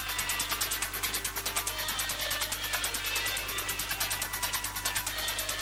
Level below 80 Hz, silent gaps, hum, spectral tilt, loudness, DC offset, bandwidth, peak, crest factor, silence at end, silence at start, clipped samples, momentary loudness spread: -48 dBFS; none; 50 Hz at -45 dBFS; 0 dB/octave; -30 LUFS; under 0.1%; over 20 kHz; -14 dBFS; 18 dB; 0 s; 0 s; under 0.1%; 2 LU